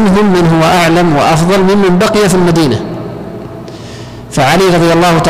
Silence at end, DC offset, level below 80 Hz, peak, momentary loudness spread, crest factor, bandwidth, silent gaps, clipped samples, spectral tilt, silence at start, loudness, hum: 0 s; under 0.1%; -32 dBFS; -4 dBFS; 18 LU; 4 dB; 16 kHz; none; under 0.1%; -5.5 dB/octave; 0 s; -8 LUFS; none